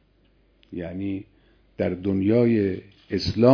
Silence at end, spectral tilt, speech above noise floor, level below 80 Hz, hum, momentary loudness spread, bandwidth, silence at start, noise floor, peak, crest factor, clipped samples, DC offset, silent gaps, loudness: 0 s; -8 dB/octave; 39 dB; -52 dBFS; none; 16 LU; 5.4 kHz; 0.7 s; -61 dBFS; -2 dBFS; 20 dB; under 0.1%; under 0.1%; none; -24 LUFS